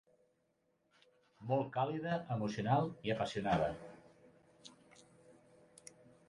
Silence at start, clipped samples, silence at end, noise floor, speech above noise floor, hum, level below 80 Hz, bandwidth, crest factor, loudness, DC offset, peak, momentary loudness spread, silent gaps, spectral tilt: 1.4 s; under 0.1%; 0.95 s; -79 dBFS; 43 dB; none; -68 dBFS; 11.5 kHz; 20 dB; -37 LUFS; under 0.1%; -20 dBFS; 23 LU; none; -6.5 dB/octave